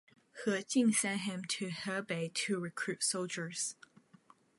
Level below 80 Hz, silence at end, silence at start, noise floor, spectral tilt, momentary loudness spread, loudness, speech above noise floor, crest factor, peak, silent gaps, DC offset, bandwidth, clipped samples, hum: -84 dBFS; 0.85 s; 0.35 s; -64 dBFS; -3 dB/octave; 9 LU; -35 LUFS; 29 dB; 18 dB; -20 dBFS; none; under 0.1%; 11.5 kHz; under 0.1%; none